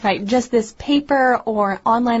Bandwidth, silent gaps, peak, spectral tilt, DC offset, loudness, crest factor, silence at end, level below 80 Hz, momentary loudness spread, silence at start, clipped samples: 8 kHz; none; -6 dBFS; -5 dB/octave; under 0.1%; -18 LUFS; 12 dB; 0 s; -50 dBFS; 4 LU; 0 s; under 0.1%